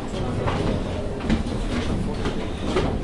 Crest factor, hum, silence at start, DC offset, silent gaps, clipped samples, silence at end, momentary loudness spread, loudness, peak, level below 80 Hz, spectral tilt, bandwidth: 16 dB; none; 0 s; under 0.1%; none; under 0.1%; 0 s; 4 LU; -26 LUFS; -8 dBFS; -30 dBFS; -6.5 dB/octave; 11.5 kHz